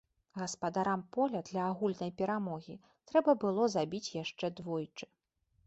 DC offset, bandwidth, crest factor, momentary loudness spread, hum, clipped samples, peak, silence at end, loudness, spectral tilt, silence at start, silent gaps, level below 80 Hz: under 0.1%; 8.2 kHz; 20 dB; 15 LU; none; under 0.1%; -16 dBFS; 0.6 s; -35 LUFS; -5.5 dB/octave; 0.35 s; none; -74 dBFS